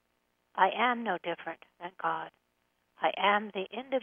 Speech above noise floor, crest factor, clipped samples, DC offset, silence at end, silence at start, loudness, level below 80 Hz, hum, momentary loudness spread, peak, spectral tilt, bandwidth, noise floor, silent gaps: 45 dB; 24 dB; under 0.1%; under 0.1%; 0 s; 0.55 s; -31 LUFS; -84 dBFS; none; 16 LU; -8 dBFS; -6.5 dB/octave; 3.7 kHz; -76 dBFS; none